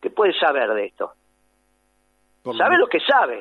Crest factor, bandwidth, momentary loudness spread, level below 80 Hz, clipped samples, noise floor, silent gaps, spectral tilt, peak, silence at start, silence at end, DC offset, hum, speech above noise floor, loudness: 16 dB; 6.4 kHz; 15 LU; -70 dBFS; under 0.1%; -65 dBFS; none; -5 dB/octave; -4 dBFS; 0 s; 0 s; under 0.1%; none; 46 dB; -19 LUFS